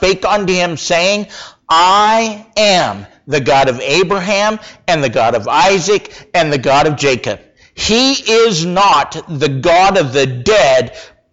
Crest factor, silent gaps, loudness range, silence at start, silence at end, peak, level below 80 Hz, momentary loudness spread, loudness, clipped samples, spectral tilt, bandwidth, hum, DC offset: 10 dB; none; 2 LU; 0 s; 0.25 s; -2 dBFS; -42 dBFS; 9 LU; -12 LUFS; under 0.1%; -3.5 dB/octave; 8 kHz; none; 0.3%